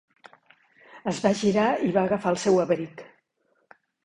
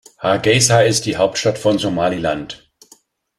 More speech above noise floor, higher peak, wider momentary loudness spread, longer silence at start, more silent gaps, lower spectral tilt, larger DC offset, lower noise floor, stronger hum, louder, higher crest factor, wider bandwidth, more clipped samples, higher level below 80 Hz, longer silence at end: first, 47 dB vs 36 dB; second, -8 dBFS vs 0 dBFS; about the same, 12 LU vs 12 LU; first, 0.95 s vs 0.2 s; neither; first, -5.5 dB/octave vs -4 dB/octave; neither; first, -71 dBFS vs -52 dBFS; neither; second, -24 LUFS vs -16 LUFS; about the same, 20 dB vs 18 dB; second, 11 kHz vs 14 kHz; neither; second, -64 dBFS vs -48 dBFS; about the same, 0.95 s vs 0.85 s